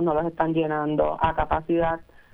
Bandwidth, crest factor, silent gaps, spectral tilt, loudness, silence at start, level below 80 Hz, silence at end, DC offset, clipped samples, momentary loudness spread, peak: 3.9 kHz; 16 dB; none; -9.5 dB/octave; -24 LUFS; 0 s; -40 dBFS; 0.3 s; under 0.1%; under 0.1%; 3 LU; -8 dBFS